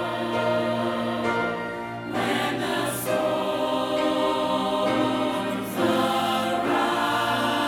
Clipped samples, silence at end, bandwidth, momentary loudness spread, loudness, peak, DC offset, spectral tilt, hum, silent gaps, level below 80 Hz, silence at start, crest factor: under 0.1%; 0 s; over 20 kHz; 4 LU; -25 LUFS; -10 dBFS; under 0.1%; -4.5 dB/octave; none; none; -58 dBFS; 0 s; 14 dB